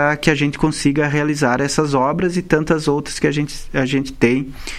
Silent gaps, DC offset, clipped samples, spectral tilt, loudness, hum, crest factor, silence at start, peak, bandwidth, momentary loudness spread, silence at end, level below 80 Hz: none; under 0.1%; under 0.1%; -5.5 dB/octave; -18 LUFS; none; 16 dB; 0 s; 0 dBFS; 14 kHz; 4 LU; 0 s; -36 dBFS